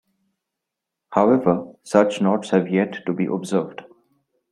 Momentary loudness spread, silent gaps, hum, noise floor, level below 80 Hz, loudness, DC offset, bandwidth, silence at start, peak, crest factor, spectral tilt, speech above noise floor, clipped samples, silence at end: 8 LU; none; none; -83 dBFS; -64 dBFS; -21 LUFS; under 0.1%; 11.5 kHz; 1.1 s; -2 dBFS; 20 dB; -7 dB/octave; 64 dB; under 0.1%; 0.7 s